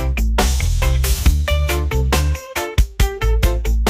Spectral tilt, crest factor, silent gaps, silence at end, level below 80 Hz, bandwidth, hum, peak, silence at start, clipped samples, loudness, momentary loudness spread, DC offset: -4.5 dB/octave; 12 dB; none; 0 s; -18 dBFS; 16 kHz; none; -4 dBFS; 0 s; under 0.1%; -18 LUFS; 3 LU; under 0.1%